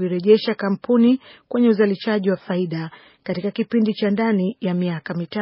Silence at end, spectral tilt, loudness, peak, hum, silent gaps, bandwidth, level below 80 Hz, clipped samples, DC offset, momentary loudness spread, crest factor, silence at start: 0 s; -6 dB/octave; -20 LUFS; -2 dBFS; none; none; 5.8 kHz; -68 dBFS; under 0.1%; under 0.1%; 10 LU; 18 dB; 0 s